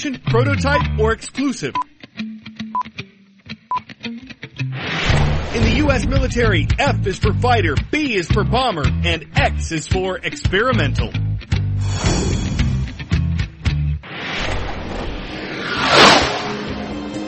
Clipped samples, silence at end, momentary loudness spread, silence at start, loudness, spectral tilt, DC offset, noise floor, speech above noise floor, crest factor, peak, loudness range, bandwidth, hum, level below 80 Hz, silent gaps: under 0.1%; 0 s; 12 LU; 0 s; -18 LUFS; -5 dB/octave; under 0.1%; -42 dBFS; 24 dB; 18 dB; 0 dBFS; 7 LU; 8.8 kHz; none; -28 dBFS; none